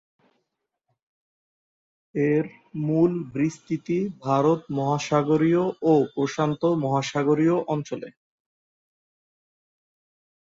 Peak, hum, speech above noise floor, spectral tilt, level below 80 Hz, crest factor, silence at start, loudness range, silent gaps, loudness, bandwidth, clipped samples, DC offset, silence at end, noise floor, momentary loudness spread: -8 dBFS; none; 57 dB; -7 dB/octave; -66 dBFS; 18 dB; 2.15 s; 5 LU; none; -24 LUFS; 7.8 kHz; under 0.1%; under 0.1%; 2.35 s; -80 dBFS; 10 LU